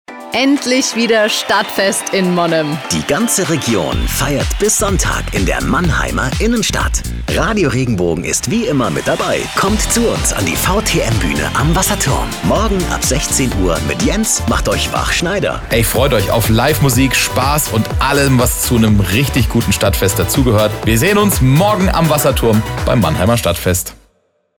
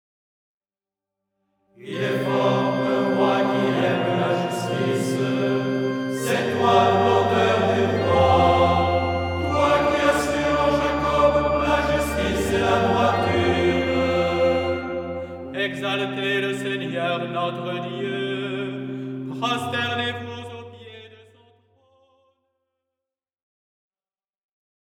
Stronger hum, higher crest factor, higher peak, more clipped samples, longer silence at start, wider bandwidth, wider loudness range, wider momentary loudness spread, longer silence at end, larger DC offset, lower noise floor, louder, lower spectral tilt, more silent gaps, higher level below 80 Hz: neither; second, 10 dB vs 18 dB; about the same, -2 dBFS vs -4 dBFS; neither; second, 0.1 s vs 1.8 s; first, over 20 kHz vs 18 kHz; second, 3 LU vs 9 LU; second, 4 LU vs 10 LU; second, 0.65 s vs 3.95 s; neither; second, -60 dBFS vs under -90 dBFS; first, -14 LUFS vs -21 LUFS; second, -4 dB/octave vs -5.5 dB/octave; neither; first, -24 dBFS vs -44 dBFS